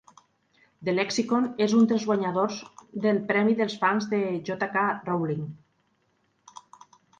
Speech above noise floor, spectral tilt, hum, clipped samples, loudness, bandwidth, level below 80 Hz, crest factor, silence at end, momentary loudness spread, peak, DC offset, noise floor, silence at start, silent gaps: 45 dB; -5.5 dB/octave; none; under 0.1%; -26 LUFS; 9 kHz; -70 dBFS; 18 dB; 1.65 s; 9 LU; -8 dBFS; under 0.1%; -70 dBFS; 0.8 s; none